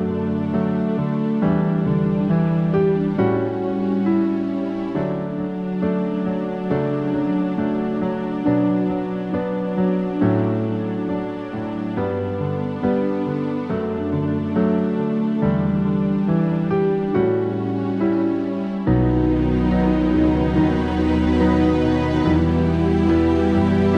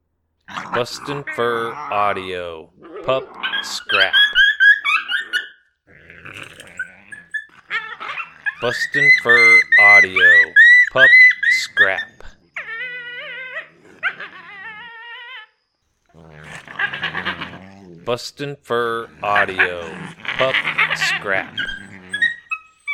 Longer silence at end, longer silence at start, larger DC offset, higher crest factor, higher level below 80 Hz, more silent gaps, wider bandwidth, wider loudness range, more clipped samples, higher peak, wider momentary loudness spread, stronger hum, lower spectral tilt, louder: about the same, 0 s vs 0 s; second, 0 s vs 0.5 s; neither; about the same, 14 dB vs 18 dB; first, -34 dBFS vs -54 dBFS; neither; second, 6.8 kHz vs 14 kHz; second, 5 LU vs 20 LU; neither; second, -6 dBFS vs 0 dBFS; second, 6 LU vs 25 LU; neither; first, -9.5 dB/octave vs -2 dB/octave; second, -20 LUFS vs -14 LUFS